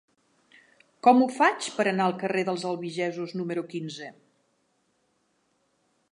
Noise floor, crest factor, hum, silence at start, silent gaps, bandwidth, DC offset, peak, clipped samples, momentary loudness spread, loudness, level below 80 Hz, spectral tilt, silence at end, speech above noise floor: -72 dBFS; 22 dB; none; 1.05 s; none; 11 kHz; under 0.1%; -6 dBFS; under 0.1%; 15 LU; -26 LUFS; -82 dBFS; -5 dB/octave; 2 s; 46 dB